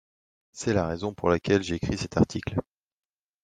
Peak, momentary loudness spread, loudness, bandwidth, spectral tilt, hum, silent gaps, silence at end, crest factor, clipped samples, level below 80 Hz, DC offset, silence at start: -8 dBFS; 8 LU; -27 LUFS; 9.8 kHz; -6 dB/octave; none; none; 0.8 s; 22 dB; under 0.1%; -50 dBFS; under 0.1%; 0.55 s